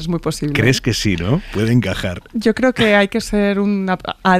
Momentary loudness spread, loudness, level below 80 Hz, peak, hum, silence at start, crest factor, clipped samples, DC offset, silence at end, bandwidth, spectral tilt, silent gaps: 8 LU; -17 LUFS; -36 dBFS; -2 dBFS; none; 0 s; 14 dB; under 0.1%; under 0.1%; 0 s; 15 kHz; -5.5 dB/octave; none